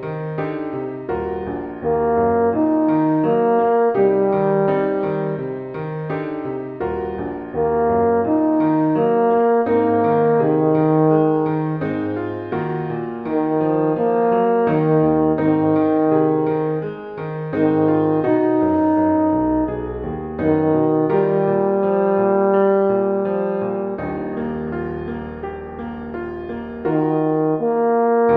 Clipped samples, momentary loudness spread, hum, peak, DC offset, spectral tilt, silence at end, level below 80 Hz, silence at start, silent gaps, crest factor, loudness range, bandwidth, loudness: under 0.1%; 11 LU; none; -4 dBFS; under 0.1%; -11.5 dB/octave; 0 s; -46 dBFS; 0 s; none; 14 dB; 6 LU; 4.1 kHz; -19 LUFS